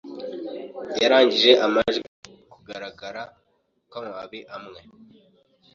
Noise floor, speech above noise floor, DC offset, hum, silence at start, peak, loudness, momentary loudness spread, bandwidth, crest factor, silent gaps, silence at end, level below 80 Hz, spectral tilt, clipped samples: -69 dBFS; 47 dB; under 0.1%; none; 0.05 s; -2 dBFS; -19 LUFS; 24 LU; 7.4 kHz; 22 dB; 2.08-2.23 s; 0.95 s; -62 dBFS; -3.5 dB/octave; under 0.1%